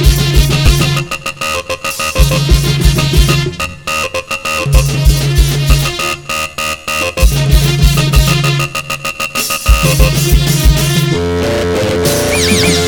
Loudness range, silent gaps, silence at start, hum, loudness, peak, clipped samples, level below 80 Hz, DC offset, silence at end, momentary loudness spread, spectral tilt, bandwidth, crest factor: 2 LU; none; 0 s; none; -12 LUFS; 0 dBFS; 0.2%; -16 dBFS; 0.3%; 0 s; 6 LU; -4.5 dB/octave; over 20 kHz; 10 dB